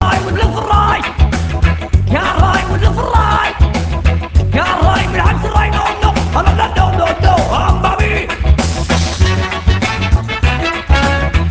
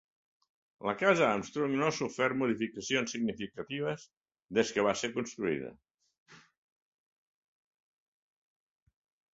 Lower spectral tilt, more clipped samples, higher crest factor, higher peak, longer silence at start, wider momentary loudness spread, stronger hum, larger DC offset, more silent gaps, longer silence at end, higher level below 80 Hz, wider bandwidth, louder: about the same, -5.5 dB/octave vs -4.5 dB/octave; first, 0.2% vs under 0.1%; second, 12 dB vs 24 dB; first, 0 dBFS vs -10 dBFS; second, 0 s vs 0.8 s; second, 3 LU vs 11 LU; neither; neither; second, none vs 4.17-4.21 s, 5.94-5.98 s, 6.18-6.26 s; second, 0 s vs 2.95 s; first, -16 dBFS vs -72 dBFS; about the same, 8 kHz vs 8 kHz; first, -13 LUFS vs -32 LUFS